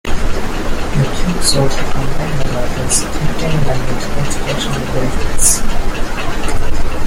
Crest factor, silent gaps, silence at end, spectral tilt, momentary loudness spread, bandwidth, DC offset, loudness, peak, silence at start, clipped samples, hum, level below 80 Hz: 12 dB; none; 0 s; -4 dB/octave; 8 LU; 15.5 kHz; under 0.1%; -17 LUFS; 0 dBFS; 0.05 s; under 0.1%; none; -18 dBFS